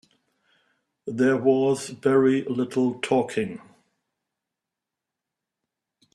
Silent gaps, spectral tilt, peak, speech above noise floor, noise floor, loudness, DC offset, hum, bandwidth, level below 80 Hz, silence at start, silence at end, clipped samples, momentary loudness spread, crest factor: none; -6 dB/octave; -8 dBFS; 64 dB; -86 dBFS; -23 LUFS; under 0.1%; none; 12 kHz; -70 dBFS; 1.05 s; 2.55 s; under 0.1%; 13 LU; 20 dB